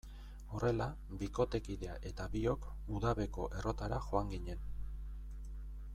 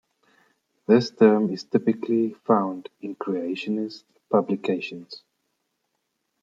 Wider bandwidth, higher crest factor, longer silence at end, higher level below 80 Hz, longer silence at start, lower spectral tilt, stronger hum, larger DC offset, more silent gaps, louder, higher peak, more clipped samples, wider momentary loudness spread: first, 13 kHz vs 7.6 kHz; about the same, 20 dB vs 20 dB; second, 0 s vs 1.25 s; first, -46 dBFS vs -76 dBFS; second, 0.05 s vs 0.9 s; about the same, -7 dB/octave vs -7 dB/octave; neither; neither; neither; second, -40 LUFS vs -24 LUFS; second, -18 dBFS vs -4 dBFS; neither; second, 13 LU vs 19 LU